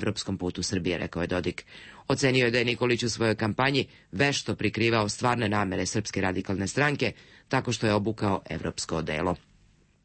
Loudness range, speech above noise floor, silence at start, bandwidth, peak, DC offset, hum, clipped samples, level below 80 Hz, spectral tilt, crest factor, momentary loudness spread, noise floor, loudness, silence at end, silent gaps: 3 LU; 34 dB; 0 s; 8.8 kHz; -10 dBFS; under 0.1%; none; under 0.1%; -54 dBFS; -4.5 dB/octave; 18 dB; 7 LU; -61 dBFS; -27 LUFS; 0.65 s; none